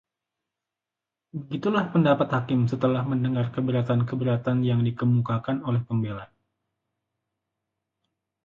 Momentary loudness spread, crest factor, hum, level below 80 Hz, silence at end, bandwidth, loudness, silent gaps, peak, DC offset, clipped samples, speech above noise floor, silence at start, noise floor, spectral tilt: 7 LU; 18 dB; none; -60 dBFS; 2.2 s; 6.8 kHz; -25 LUFS; none; -8 dBFS; under 0.1%; under 0.1%; 64 dB; 1.35 s; -88 dBFS; -9.5 dB/octave